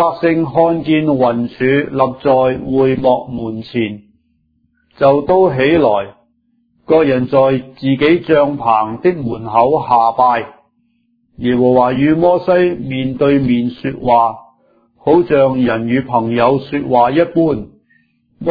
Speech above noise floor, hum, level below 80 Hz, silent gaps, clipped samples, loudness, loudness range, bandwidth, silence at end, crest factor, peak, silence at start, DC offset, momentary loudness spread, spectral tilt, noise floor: 47 dB; none; -46 dBFS; none; under 0.1%; -14 LUFS; 2 LU; 5 kHz; 0 s; 14 dB; 0 dBFS; 0 s; under 0.1%; 9 LU; -10 dB/octave; -60 dBFS